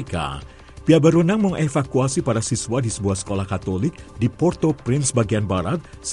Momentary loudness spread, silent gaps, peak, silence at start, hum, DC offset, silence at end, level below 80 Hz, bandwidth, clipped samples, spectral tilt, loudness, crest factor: 11 LU; none; -2 dBFS; 0 s; none; under 0.1%; 0 s; -44 dBFS; 11.5 kHz; under 0.1%; -6 dB/octave; -21 LUFS; 18 dB